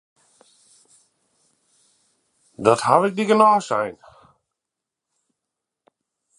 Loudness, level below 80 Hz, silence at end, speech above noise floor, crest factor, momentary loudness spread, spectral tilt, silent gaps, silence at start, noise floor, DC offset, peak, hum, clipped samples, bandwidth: -18 LUFS; -68 dBFS; 2.45 s; 67 dB; 24 dB; 10 LU; -5 dB/octave; none; 2.6 s; -85 dBFS; under 0.1%; 0 dBFS; none; under 0.1%; 11.5 kHz